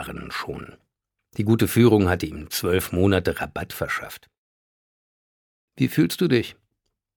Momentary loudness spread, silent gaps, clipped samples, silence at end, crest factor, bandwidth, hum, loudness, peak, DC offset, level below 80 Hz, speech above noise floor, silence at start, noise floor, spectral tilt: 17 LU; 4.38-5.68 s; under 0.1%; 0.65 s; 20 dB; 19 kHz; none; -22 LUFS; -4 dBFS; under 0.1%; -48 dBFS; 56 dB; 0 s; -78 dBFS; -6 dB/octave